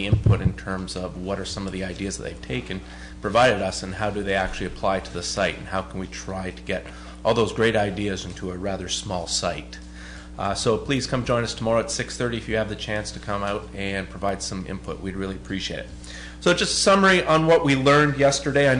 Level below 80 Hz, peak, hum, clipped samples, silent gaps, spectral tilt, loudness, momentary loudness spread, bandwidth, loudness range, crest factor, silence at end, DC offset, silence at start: -40 dBFS; -8 dBFS; none; under 0.1%; none; -4.5 dB/octave; -24 LUFS; 15 LU; 10.5 kHz; 8 LU; 14 dB; 0 s; under 0.1%; 0 s